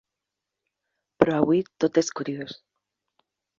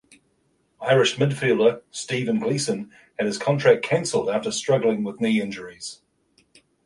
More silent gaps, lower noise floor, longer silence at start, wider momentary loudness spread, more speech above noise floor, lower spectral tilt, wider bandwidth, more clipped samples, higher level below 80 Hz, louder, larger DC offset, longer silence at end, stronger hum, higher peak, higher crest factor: neither; first, -86 dBFS vs -67 dBFS; first, 1.2 s vs 0.8 s; about the same, 13 LU vs 14 LU; first, 61 dB vs 45 dB; about the same, -5.5 dB/octave vs -5 dB/octave; second, 7.6 kHz vs 11.5 kHz; neither; about the same, -62 dBFS vs -64 dBFS; about the same, -24 LUFS vs -22 LUFS; neither; first, 1.05 s vs 0.9 s; neither; about the same, -2 dBFS vs -2 dBFS; about the same, 24 dB vs 20 dB